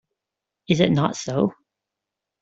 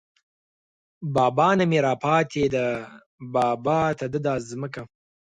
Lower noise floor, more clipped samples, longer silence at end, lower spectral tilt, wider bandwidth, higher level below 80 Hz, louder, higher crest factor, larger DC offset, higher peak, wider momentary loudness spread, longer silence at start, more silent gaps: second, -85 dBFS vs under -90 dBFS; neither; first, 0.9 s vs 0.35 s; about the same, -6 dB/octave vs -6.5 dB/octave; second, 8 kHz vs 11 kHz; about the same, -58 dBFS vs -56 dBFS; about the same, -22 LUFS vs -23 LUFS; about the same, 22 dB vs 18 dB; neither; first, -2 dBFS vs -6 dBFS; second, 6 LU vs 15 LU; second, 0.7 s vs 1 s; second, none vs 3.06-3.18 s